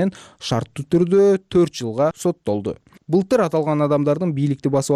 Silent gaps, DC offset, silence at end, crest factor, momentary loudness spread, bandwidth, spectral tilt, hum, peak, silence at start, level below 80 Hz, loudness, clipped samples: none; under 0.1%; 0 s; 12 dB; 9 LU; 14 kHz; -7 dB/octave; none; -8 dBFS; 0 s; -54 dBFS; -19 LUFS; under 0.1%